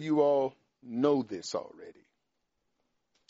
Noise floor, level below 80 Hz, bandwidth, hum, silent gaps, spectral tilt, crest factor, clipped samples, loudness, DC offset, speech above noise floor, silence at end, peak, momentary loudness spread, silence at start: -82 dBFS; -80 dBFS; 7.6 kHz; none; none; -5.5 dB/octave; 20 dB; under 0.1%; -30 LUFS; under 0.1%; 52 dB; 1.4 s; -12 dBFS; 13 LU; 0 s